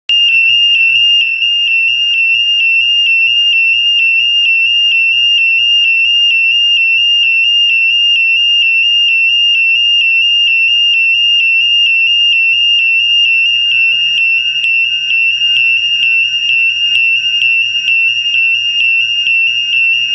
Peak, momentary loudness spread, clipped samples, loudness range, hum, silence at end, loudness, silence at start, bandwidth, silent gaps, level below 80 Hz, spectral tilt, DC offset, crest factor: 0 dBFS; 2 LU; under 0.1%; 2 LU; none; 0 s; -7 LUFS; 0.1 s; 8.4 kHz; none; -64 dBFS; 2.5 dB/octave; under 0.1%; 10 dB